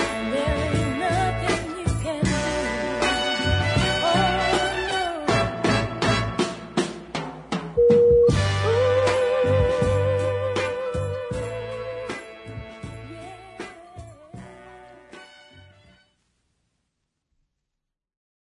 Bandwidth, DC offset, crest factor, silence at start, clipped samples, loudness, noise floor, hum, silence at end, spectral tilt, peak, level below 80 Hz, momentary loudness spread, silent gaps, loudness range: 11 kHz; under 0.1%; 16 dB; 0 s; under 0.1%; -23 LUFS; -83 dBFS; none; 2.9 s; -5 dB/octave; -8 dBFS; -40 dBFS; 19 LU; none; 20 LU